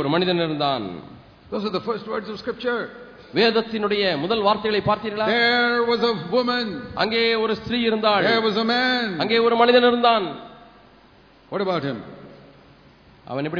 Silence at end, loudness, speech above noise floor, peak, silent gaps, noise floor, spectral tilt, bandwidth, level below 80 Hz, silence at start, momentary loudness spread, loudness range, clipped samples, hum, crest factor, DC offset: 0 s; -21 LUFS; 31 dB; -4 dBFS; none; -52 dBFS; -6.5 dB/octave; 5.4 kHz; -56 dBFS; 0 s; 13 LU; 7 LU; under 0.1%; none; 18 dB; under 0.1%